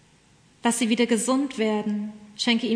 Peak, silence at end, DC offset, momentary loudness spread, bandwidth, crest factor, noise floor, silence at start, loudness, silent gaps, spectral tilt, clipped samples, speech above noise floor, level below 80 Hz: -10 dBFS; 0 s; under 0.1%; 8 LU; 11 kHz; 14 dB; -57 dBFS; 0.65 s; -24 LUFS; none; -3.5 dB/octave; under 0.1%; 34 dB; -70 dBFS